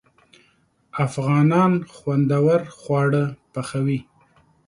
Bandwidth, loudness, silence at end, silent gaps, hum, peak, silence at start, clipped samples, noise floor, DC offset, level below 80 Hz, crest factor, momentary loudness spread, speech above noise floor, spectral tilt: 11.5 kHz; -21 LUFS; 0.65 s; none; none; -6 dBFS; 0.95 s; under 0.1%; -62 dBFS; under 0.1%; -60 dBFS; 16 dB; 11 LU; 42 dB; -8 dB/octave